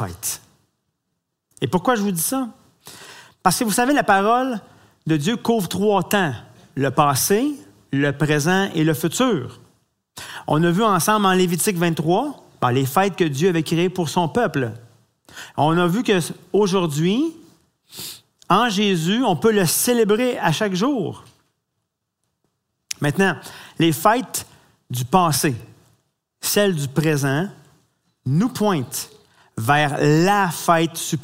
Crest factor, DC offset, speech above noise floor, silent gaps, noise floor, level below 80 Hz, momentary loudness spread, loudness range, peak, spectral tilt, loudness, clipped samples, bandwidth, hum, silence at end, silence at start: 20 dB; under 0.1%; 58 dB; none; -77 dBFS; -56 dBFS; 15 LU; 4 LU; 0 dBFS; -4.5 dB/octave; -19 LUFS; under 0.1%; 16 kHz; none; 0 s; 0 s